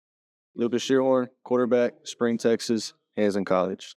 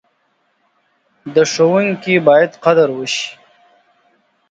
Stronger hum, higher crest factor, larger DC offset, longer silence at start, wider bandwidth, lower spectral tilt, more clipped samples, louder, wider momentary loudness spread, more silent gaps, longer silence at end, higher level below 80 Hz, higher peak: neither; about the same, 16 dB vs 16 dB; neither; second, 0.55 s vs 1.25 s; first, 13 kHz vs 9 kHz; about the same, -5 dB/octave vs -4.5 dB/octave; neither; second, -25 LUFS vs -14 LUFS; about the same, 7 LU vs 9 LU; neither; second, 0.05 s vs 1.15 s; second, -86 dBFS vs -66 dBFS; second, -10 dBFS vs 0 dBFS